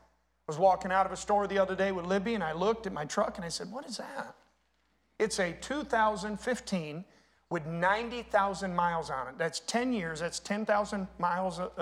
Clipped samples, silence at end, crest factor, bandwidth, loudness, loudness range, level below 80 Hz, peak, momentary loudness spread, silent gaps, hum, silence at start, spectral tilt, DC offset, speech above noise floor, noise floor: under 0.1%; 0 s; 20 dB; 14.5 kHz; -32 LUFS; 4 LU; -60 dBFS; -12 dBFS; 10 LU; none; none; 0.5 s; -4.5 dB/octave; under 0.1%; 42 dB; -73 dBFS